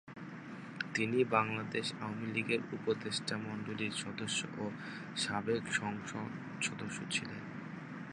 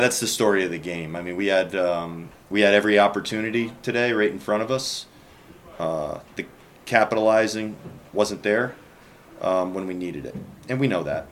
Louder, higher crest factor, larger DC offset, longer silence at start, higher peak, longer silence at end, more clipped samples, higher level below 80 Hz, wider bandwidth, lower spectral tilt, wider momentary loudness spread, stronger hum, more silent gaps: second, -37 LUFS vs -23 LUFS; about the same, 26 dB vs 22 dB; neither; about the same, 0.05 s vs 0 s; second, -12 dBFS vs -2 dBFS; about the same, 0 s vs 0 s; neither; second, -74 dBFS vs -58 dBFS; second, 11 kHz vs 16.5 kHz; about the same, -4 dB/octave vs -4 dB/octave; second, 13 LU vs 16 LU; neither; neither